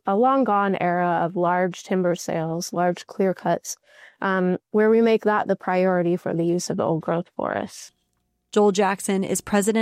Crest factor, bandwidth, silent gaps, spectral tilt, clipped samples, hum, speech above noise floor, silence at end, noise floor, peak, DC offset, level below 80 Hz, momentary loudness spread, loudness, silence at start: 12 dB; 15.5 kHz; none; -5.5 dB/octave; under 0.1%; none; 51 dB; 0 s; -72 dBFS; -10 dBFS; under 0.1%; -64 dBFS; 8 LU; -22 LUFS; 0.05 s